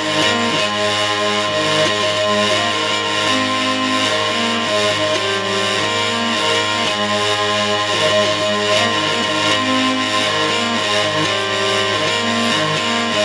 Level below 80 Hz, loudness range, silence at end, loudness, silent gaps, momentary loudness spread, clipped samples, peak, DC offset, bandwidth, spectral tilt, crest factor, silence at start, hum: -56 dBFS; 1 LU; 0 s; -16 LUFS; none; 2 LU; under 0.1%; -2 dBFS; under 0.1%; 11 kHz; -2.5 dB/octave; 14 dB; 0 s; none